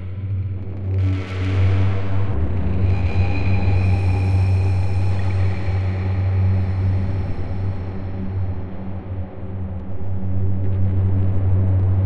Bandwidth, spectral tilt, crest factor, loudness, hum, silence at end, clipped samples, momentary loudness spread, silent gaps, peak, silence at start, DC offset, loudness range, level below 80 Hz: 5.6 kHz; -9 dB/octave; 12 dB; -22 LUFS; none; 0 s; under 0.1%; 11 LU; none; -6 dBFS; 0 s; under 0.1%; 7 LU; -32 dBFS